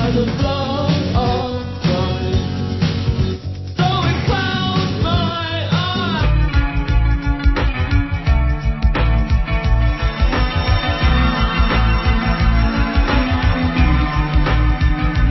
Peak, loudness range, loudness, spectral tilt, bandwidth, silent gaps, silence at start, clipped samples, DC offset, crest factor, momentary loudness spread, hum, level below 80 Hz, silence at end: -2 dBFS; 2 LU; -18 LUFS; -7 dB/octave; 6 kHz; none; 0 s; under 0.1%; under 0.1%; 14 dB; 3 LU; none; -18 dBFS; 0 s